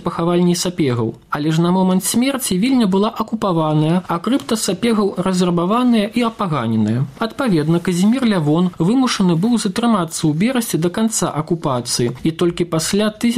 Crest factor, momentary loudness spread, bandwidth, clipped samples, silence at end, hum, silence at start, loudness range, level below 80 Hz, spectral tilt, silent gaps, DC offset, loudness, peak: 12 dB; 5 LU; 16 kHz; under 0.1%; 0 s; none; 0 s; 1 LU; -50 dBFS; -5.5 dB/octave; none; 0.1%; -17 LUFS; -6 dBFS